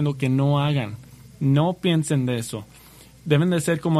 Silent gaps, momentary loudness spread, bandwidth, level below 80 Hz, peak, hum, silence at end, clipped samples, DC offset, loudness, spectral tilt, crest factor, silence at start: none; 13 LU; 13 kHz; -56 dBFS; -4 dBFS; none; 0 s; under 0.1%; under 0.1%; -22 LUFS; -6.5 dB/octave; 18 dB; 0 s